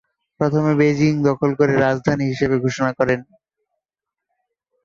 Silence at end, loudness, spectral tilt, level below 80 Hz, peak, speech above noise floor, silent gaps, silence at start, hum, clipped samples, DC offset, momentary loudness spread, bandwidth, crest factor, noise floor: 1.6 s; -18 LUFS; -7 dB/octave; -52 dBFS; -2 dBFS; 67 dB; none; 0.4 s; none; under 0.1%; under 0.1%; 4 LU; 7.6 kHz; 16 dB; -85 dBFS